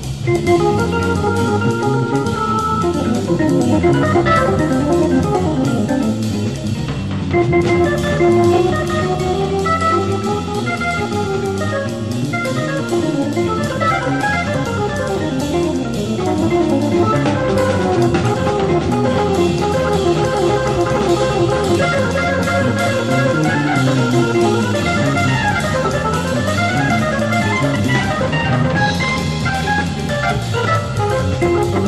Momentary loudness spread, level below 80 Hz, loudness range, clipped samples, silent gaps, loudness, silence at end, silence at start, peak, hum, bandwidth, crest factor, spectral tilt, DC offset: 5 LU; -36 dBFS; 3 LU; under 0.1%; none; -16 LUFS; 0 s; 0 s; -2 dBFS; none; 13.5 kHz; 14 dB; -6 dB/octave; 0.5%